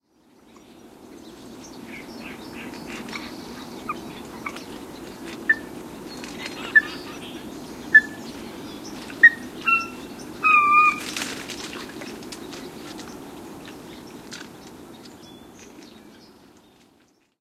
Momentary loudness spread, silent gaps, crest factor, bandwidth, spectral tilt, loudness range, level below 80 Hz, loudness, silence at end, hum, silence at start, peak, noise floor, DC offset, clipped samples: 27 LU; none; 24 dB; 16 kHz; -2.5 dB/octave; 21 LU; -60 dBFS; -20 LUFS; 0.95 s; none; 0.55 s; -2 dBFS; -61 dBFS; under 0.1%; under 0.1%